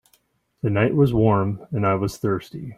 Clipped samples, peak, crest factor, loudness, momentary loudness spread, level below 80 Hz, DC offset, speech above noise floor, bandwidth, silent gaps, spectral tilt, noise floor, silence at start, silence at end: under 0.1%; -4 dBFS; 16 dB; -21 LUFS; 8 LU; -46 dBFS; under 0.1%; 43 dB; 15 kHz; none; -8 dB/octave; -64 dBFS; 0.65 s; 0.05 s